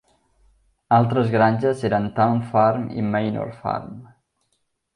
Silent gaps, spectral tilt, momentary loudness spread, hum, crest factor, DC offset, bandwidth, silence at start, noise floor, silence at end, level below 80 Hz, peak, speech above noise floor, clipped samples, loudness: none; -8.5 dB/octave; 10 LU; none; 18 dB; under 0.1%; 10.5 kHz; 0.9 s; -72 dBFS; 0.9 s; -56 dBFS; -4 dBFS; 52 dB; under 0.1%; -21 LUFS